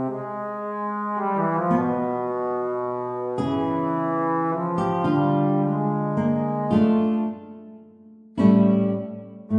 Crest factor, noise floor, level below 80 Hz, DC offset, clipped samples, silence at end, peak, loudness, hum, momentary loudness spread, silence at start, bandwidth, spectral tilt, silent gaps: 18 dB; -48 dBFS; -60 dBFS; under 0.1%; under 0.1%; 0 s; -6 dBFS; -23 LUFS; none; 11 LU; 0 s; 7 kHz; -9.5 dB/octave; none